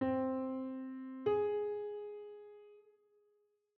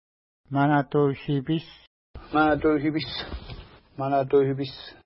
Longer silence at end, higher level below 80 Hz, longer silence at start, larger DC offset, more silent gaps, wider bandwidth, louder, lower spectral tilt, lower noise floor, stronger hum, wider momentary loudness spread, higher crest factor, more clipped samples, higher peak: first, 0.95 s vs 0.15 s; second, -78 dBFS vs -48 dBFS; second, 0 s vs 0.5 s; neither; second, none vs 1.87-2.14 s; second, 4.3 kHz vs 5.8 kHz; second, -39 LUFS vs -25 LUFS; second, -6 dB/octave vs -11 dB/octave; first, -77 dBFS vs -43 dBFS; neither; first, 19 LU vs 16 LU; about the same, 16 dB vs 16 dB; neither; second, -24 dBFS vs -10 dBFS